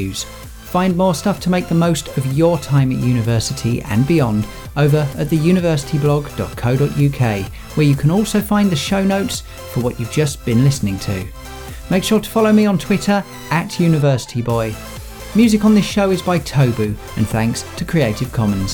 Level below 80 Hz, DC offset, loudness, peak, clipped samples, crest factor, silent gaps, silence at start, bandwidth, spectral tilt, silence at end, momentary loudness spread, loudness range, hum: -36 dBFS; under 0.1%; -17 LUFS; -2 dBFS; under 0.1%; 14 dB; none; 0 s; over 20 kHz; -6 dB/octave; 0 s; 10 LU; 1 LU; none